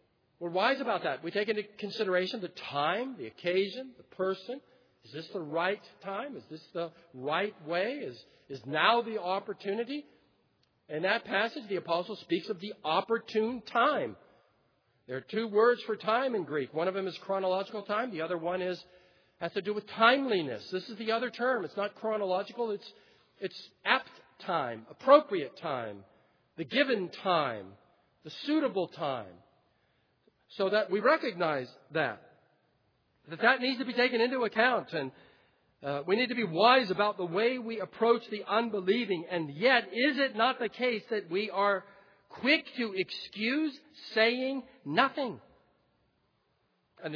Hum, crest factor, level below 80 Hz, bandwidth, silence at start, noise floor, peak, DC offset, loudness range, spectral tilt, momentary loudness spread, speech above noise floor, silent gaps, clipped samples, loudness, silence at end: none; 24 dB; -82 dBFS; 5.4 kHz; 0.4 s; -75 dBFS; -8 dBFS; under 0.1%; 6 LU; -6 dB/octave; 15 LU; 44 dB; none; under 0.1%; -31 LUFS; 0 s